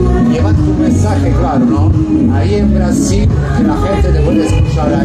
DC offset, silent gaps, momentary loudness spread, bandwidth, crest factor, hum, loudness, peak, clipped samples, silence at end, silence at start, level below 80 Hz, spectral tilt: under 0.1%; none; 1 LU; 10.5 kHz; 8 dB; none; -11 LUFS; -2 dBFS; under 0.1%; 0 s; 0 s; -18 dBFS; -7.5 dB/octave